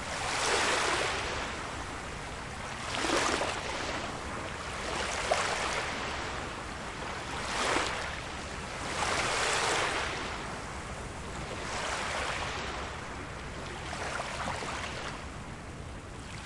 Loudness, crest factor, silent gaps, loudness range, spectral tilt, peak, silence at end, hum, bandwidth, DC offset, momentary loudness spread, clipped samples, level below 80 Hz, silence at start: -33 LUFS; 22 dB; none; 5 LU; -2.5 dB/octave; -12 dBFS; 0 s; none; 11.5 kHz; under 0.1%; 12 LU; under 0.1%; -48 dBFS; 0 s